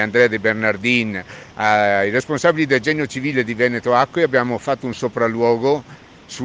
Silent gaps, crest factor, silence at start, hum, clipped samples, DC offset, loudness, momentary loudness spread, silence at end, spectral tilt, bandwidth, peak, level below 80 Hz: none; 16 dB; 0 s; none; under 0.1%; under 0.1%; -18 LUFS; 8 LU; 0 s; -5.5 dB/octave; 9.6 kHz; -2 dBFS; -56 dBFS